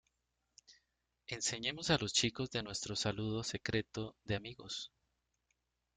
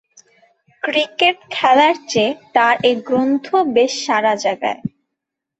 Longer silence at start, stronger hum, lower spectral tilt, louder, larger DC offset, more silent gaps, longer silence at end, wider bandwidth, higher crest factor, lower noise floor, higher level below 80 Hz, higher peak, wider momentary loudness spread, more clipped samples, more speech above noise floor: second, 0.7 s vs 0.85 s; neither; about the same, -3.5 dB/octave vs -3.5 dB/octave; second, -38 LUFS vs -16 LUFS; neither; neither; first, 1.1 s vs 0.7 s; first, 9.6 kHz vs 8.2 kHz; first, 22 dB vs 16 dB; first, -85 dBFS vs -80 dBFS; about the same, -64 dBFS vs -64 dBFS; second, -18 dBFS vs -2 dBFS; first, 11 LU vs 8 LU; neither; second, 46 dB vs 64 dB